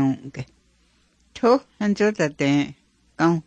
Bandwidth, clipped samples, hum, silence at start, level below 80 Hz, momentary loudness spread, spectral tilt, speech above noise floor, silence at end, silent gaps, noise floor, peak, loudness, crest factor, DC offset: 9.2 kHz; under 0.1%; none; 0 s; -58 dBFS; 17 LU; -6.5 dB/octave; 41 dB; 0.05 s; none; -62 dBFS; -6 dBFS; -22 LUFS; 16 dB; under 0.1%